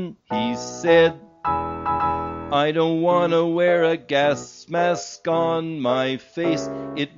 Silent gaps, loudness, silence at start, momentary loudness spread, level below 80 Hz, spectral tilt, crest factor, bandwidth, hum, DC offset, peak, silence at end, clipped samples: none; -21 LUFS; 0 s; 9 LU; -52 dBFS; -4 dB/octave; 16 dB; 7.6 kHz; none; under 0.1%; -6 dBFS; 0.1 s; under 0.1%